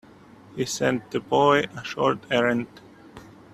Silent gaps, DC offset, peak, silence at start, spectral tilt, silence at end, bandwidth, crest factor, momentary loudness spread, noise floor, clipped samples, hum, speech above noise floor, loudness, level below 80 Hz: none; under 0.1%; -4 dBFS; 0.5 s; -4.5 dB/octave; 0.25 s; 14.5 kHz; 20 dB; 12 LU; -49 dBFS; under 0.1%; none; 26 dB; -24 LUFS; -60 dBFS